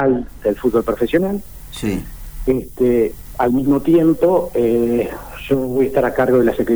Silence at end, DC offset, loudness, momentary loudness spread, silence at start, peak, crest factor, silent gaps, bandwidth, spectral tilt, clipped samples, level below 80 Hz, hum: 0 s; 0.5%; -17 LUFS; 11 LU; 0 s; -4 dBFS; 12 dB; none; over 20 kHz; -7.5 dB/octave; under 0.1%; -36 dBFS; none